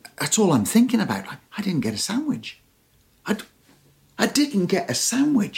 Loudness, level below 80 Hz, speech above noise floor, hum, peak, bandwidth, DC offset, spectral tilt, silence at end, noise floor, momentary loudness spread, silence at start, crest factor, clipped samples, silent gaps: -22 LUFS; -62 dBFS; 39 dB; none; -4 dBFS; 17 kHz; under 0.1%; -4 dB/octave; 0 s; -60 dBFS; 12 LU; 0.05 s; 18 dB; under 0.1%; none